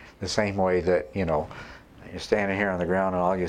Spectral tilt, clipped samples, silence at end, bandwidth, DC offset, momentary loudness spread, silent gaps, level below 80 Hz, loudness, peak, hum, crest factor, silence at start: -5.5 dB/octave; under 0.1%; 0 s; 11.5 kHz; under 0.1%; 17 LU; none; -48 dBFS; -26 LUFS; -6 dBFS; none; 20 dB; 0 s